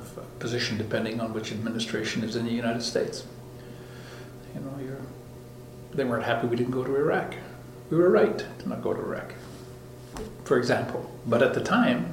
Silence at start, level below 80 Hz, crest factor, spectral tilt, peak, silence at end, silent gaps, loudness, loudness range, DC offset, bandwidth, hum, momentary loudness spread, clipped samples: 0 s; -56 dBFS; 20 dB; -5.5 dB/octave; -8 dBFS; 0 s; none; -27 LUFS; 7 LU; under 0.1%; 16.5 kHz; none; 20 LU; under 0.1%